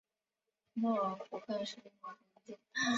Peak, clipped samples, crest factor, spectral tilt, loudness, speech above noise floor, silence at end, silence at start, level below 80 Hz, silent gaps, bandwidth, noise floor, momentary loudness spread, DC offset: -24 dBFS; under 0.1%; 16 dB; -2.5 dB/octave; -39 LUFS; over 52 dB; 0 s; 0.75 s; -84 dBFS; none; 7.6 kHz; under -90 dBFS; 20 LU; under 0.1%